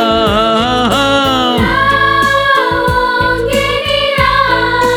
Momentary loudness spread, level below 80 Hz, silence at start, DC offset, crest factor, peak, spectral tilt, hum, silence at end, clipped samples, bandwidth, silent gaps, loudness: 3 LU; -28 dBFS; 0 s; under 0.1%; 10 dB; 0 dBFS; -4.5 dB/octave; none; 0 s; under 0.1%; 19.5 kHz; none; -11 LUFS